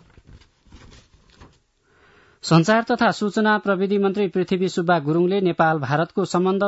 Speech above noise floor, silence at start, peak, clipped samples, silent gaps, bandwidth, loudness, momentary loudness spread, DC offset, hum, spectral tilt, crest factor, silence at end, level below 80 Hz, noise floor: 41 dB; 0.35 s; -4 dBFS; under 0.1%; none; 8 kHz; -20 LUFS; 4 LU; under 0.1%; none; -6 dB/octave; 16 dB; 0 s; -58 dBFS; -60 dBFS